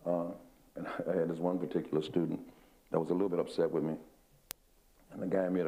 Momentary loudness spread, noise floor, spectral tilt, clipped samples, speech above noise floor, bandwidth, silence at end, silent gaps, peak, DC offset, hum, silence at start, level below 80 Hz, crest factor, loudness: 16 LU; -66 dBFS; -7 dB/octave; under 0.1%; 33 dB; 15.5 kHz; 0 s; none; -10 dBFS; under 0.1%; none; 0 s; -68 dBFS; 24 dB; -35 LUFS